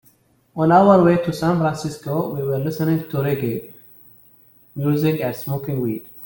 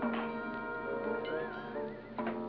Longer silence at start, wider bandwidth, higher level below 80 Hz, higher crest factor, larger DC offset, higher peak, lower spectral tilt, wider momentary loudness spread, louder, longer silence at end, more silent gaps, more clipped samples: first, 0.55 s vs 0 s; first, 17 kHz vs 5.4 kHz; first, -54 dBFS vs -62 dBFS; about the same, 18 dB vs 14 dB; neither; first, -2 dBFS vs -22 dBFS; first, -8 dB/octave vs -4 dB/octave; first, 13 LU vs 5 LU; first, -19 LUFS vs -38 LUFS; about the same, 0 s vs 0 s; neither; neither